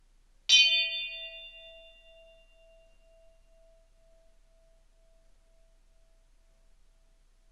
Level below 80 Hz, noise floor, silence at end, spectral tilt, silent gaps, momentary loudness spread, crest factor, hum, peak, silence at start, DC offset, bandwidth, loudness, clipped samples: -62 dBFS; -63 dBFS; 5.85 s; 4 dB/octave; none; 28 LU; 26 dB; none; -8 dBFS; 0.5 s; under 0.1%; 12 kHz; -24 LUFS; under 0.1%